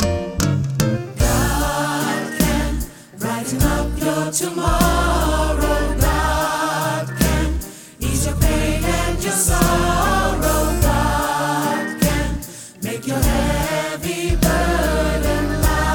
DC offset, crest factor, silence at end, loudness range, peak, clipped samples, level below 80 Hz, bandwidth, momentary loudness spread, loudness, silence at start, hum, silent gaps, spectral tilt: under 0.1%; 18 dB; 0 s; 3 LU; 0 dBFS; under 0.1%; -24 dBFS; 19 kHz; 7 LU; -19 LUFS; 0 s; none; none; -4.5 dB/octave